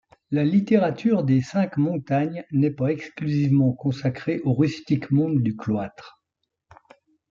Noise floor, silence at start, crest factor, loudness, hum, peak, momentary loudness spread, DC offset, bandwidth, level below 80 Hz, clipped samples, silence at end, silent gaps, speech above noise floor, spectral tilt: -80 dBFS; 0.3 s; 16 dB; -23 LUFS; none; -6 dBFS; 7 LU; under 0.1%; 7.4 kHz; -62 dBFS; under 0.1%; 1.25 s; none; 58 dB; -8.5 dB/octave